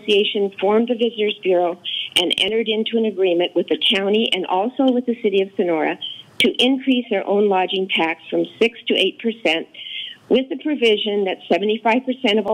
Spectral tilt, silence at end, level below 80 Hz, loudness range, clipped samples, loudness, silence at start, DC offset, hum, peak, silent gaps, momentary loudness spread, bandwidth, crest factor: -4.5 dB/octave; 0 s; -66 dBFS; 2 LU; under 0.1%; -19 LUFS; 0 s; under 0.1%; none; -6 dBFS; none; 5 LU; 16 kHz; 14 dB